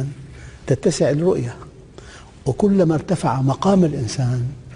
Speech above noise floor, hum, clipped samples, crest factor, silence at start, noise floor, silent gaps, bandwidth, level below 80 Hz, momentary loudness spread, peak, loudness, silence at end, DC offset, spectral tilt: 23 dB; none; under 0.1%; 14 dB; 0 s; -40 dBFS; none; 10.5 kHz; -44 dBFS; 15 LU; -4 dBFS; -19 LUFS; 0 s; under 0.1%; -7 dB/octave